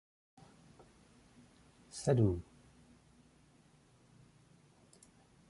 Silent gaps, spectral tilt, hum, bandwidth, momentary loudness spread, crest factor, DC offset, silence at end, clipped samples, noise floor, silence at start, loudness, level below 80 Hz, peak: none; -7 dB/octave; none; 11.5 kHz; 31 LU; 24 dB; under 0.1%; 3.1 s; under 0.1%; -66 dBFS; 1.95 s; -35 LUFS; -60 dBFS; -18 dBFS